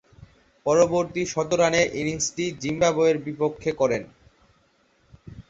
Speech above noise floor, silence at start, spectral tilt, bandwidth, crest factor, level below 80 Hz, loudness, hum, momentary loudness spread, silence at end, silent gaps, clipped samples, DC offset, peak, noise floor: 41 dB; 0.65 s; -4 dB/octave; 8 kHz; 18 dB; -54 dBFS; -23 LUFS; none; 8 LU; 0.1 s; none; under 0.1%; under 0.1%; -6 dBFS; -63 dBFS